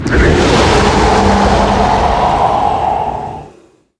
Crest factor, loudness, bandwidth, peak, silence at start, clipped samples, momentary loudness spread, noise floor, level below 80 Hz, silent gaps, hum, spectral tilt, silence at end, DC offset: 10 dB; -11 LUFS; 10.5 kHz; 0 dBFS; 0 s; under 0.1%; 9 LU; -45 dBFS; -20 dBFS; none; none; -5.5 dB/octave; 0.5 s; under 0.1%